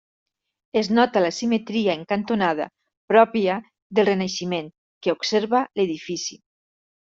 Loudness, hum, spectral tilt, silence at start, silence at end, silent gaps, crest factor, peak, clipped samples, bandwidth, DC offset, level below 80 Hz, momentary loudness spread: -22 LUFS; none; -4.5 dB/octave; 0.75 s; 0.75 s; 2.97-3.08 s, 3.82-3.90 s, 4.78-5.01 s; 20 dB; -2 dBFS; under 0.1%; 7.8 kHz; under 0.1%; -66 dBFS; 11 LU